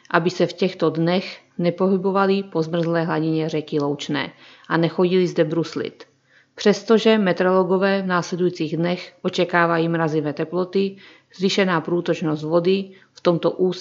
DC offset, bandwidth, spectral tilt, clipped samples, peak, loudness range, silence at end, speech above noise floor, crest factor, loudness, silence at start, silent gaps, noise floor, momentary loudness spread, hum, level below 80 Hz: under 0.1%; 7.6 kHz; -6.5 dB/octave; under 0.1%; 0 dBFS; 3 LU; 0 s; 34 dB; 20 dB; -21 LUFS; 0.1 s; none; -54 dBFS; 7 LU; none; -74 dBFS